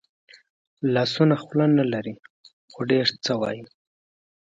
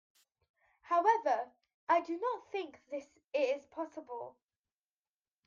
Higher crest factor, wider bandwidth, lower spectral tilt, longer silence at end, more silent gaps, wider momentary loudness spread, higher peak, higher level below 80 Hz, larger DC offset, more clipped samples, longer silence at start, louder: about the same, 20 dB vs 20 dB; about the same, 7.8 kHz vs 7.4 kHz; first, -6.5 dB/octave vs -3.5 dB/octave; second, 0.85 s vs 1.15 s; first, 2.30-2.44 s, 2.53-2.68 s vs 1.74-1.87 s; about the same, 14 LU vs 16 LU; first, -6 dBFS vs -16 dBFS; first, -68 dBFS vs -88 dBFS; neither; neither; about the same, 0.8 s vs 0.85 s; first, -23 LUFS vs -35 LUFS